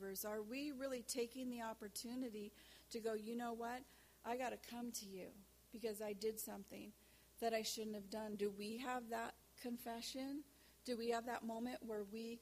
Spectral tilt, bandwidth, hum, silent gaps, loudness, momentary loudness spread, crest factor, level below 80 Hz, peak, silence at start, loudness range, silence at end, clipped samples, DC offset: -3.5 dB/octave; 15.5 kHz; none; none; -48 LUFS; 13 LU; 18 dB; -76 dBFS; -30 dBFS; 0 s; 2 LU; 0 s; under 0.1%; under 0.1%